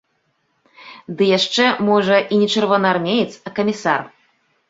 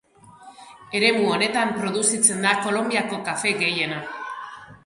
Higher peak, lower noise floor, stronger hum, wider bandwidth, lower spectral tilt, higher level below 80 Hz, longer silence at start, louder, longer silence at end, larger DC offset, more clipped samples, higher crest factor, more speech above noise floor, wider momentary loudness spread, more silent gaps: about the same, -2 dBFS vs -2 dBFS; first, -67 dBFS vs -47 dBFS; neither; second, 7.8 kHz vs 12 kHz; first, -4.5 dB/octave vs -2 dB/octave; about the same, -62 dBFS vs -66 dBFS; first, 0.8 s vs 0.25 s; first, -17 LUFS vs -21 LUFS; first, 0.6 s vs 0.1 s; neither; neither; about the same, 18 dB vs 22 dB; first, 50 dB vs 25 dB; second, 8 LU vs 15 LU; neither